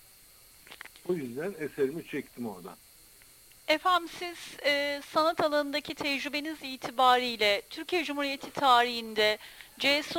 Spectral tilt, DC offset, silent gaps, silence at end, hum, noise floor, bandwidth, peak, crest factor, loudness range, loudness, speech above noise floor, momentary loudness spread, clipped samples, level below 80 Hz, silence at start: -3 dB/octave; under 0.1%; none; 0 s; none; -57 dBFS; 17 kHz; -10 dBFS; 20 dB; 10 LU; -29 LUFS; 27 dB; 16 LU; under 0.1%; -66 dBFS; 0.7 s